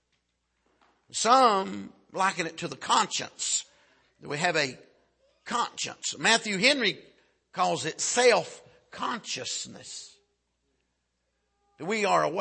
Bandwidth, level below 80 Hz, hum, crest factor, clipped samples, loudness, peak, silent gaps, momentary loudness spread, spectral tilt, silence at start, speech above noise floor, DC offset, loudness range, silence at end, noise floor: 8.8 kHz; -76 dBFS; 60 Hz at -65 dBFS; 22 dB; under 0.1%; -26 LUFS; -6 dBFS; none; 18 LU; -2 dB/octave; 1.15 s; 51 dB; under 0.1%; 7 LU; 0 s; -78 dBFS